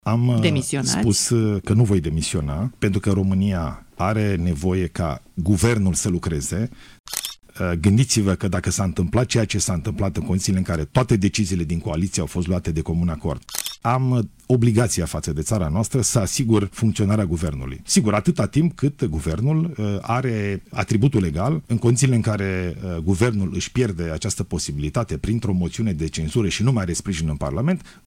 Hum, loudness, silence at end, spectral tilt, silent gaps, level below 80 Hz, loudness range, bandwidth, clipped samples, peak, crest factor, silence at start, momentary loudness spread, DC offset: none; -21 LUFS; 0.15 s; -5.5 dB/octave; 7.00-7.04 s; -38 dBFS; 3 LU; 16 kHz; under 0.1%; -4 dBFS; 18 dB; 0.05 s; 8 LU; under 0.1%